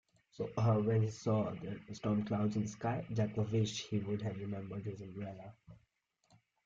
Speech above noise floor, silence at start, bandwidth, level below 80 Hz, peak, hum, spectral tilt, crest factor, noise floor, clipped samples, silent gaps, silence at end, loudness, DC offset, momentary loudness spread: 39 dB; 0.4 s; 7.6 kHz; -68 dBFS; -20 dBFS; none; -7 dB/octave; 16 dB; -75 dBFS; under 0.1%; none; 0.9 s; -37 LUFS; under 0.1%; 13 LU